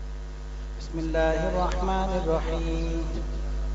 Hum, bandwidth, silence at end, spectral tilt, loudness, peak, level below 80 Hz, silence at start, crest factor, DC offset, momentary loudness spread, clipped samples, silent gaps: none; 7.8 kHz; 0 s; -6.5 dB/octave; -28 LUFS; -12 dBFS; -30 dBFS; 0 s; 16 dB; under 0.1%; 13 LU; under 0.1%; none